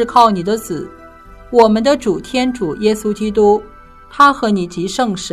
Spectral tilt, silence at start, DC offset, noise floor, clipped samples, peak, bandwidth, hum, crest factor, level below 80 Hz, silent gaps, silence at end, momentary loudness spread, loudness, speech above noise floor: -5 dB/octave; 0 s; under 0.1%; -38 dBFS; 0.4%; 0 dBFS; 14 kHz; none; 14 dB; -42 dBFS; none; 0 s; 9 LU; -14 LUFS; 24 dB